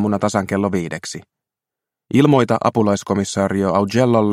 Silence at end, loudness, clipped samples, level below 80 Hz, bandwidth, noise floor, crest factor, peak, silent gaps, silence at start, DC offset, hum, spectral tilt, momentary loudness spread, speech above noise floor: 0 s; -17 LUFS; under 0.1%; -56 dBFS; 14.5 kHz; -86 dBFS; 18 dB; 0 dBFS; none; 0 s; under 0.1%; none; -6 dB/octave; 11 LU; 69 dB